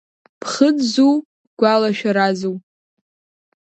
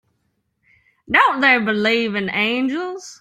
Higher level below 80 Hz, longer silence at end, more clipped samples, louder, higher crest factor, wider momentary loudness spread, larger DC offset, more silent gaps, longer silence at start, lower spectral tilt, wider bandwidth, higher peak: second, -70 dBFS vs -58 dBFS; first, 1.05 s vs 0.05 s; neither; about the same, -17 LUFS vs -17 LUFS; about the same, 18 dB vs 18 dB; about the same, 11 LU vs 10 LU; neither; first, 1.25-1.57 s vs none; second, 0.45 s vs 1.1 s; about the same, -5 dB/octave vs -4.5 dB/octave; second, 8.8 kHz vs 14.5 kHz; about the same, 0 dBFS vs -2 dBFS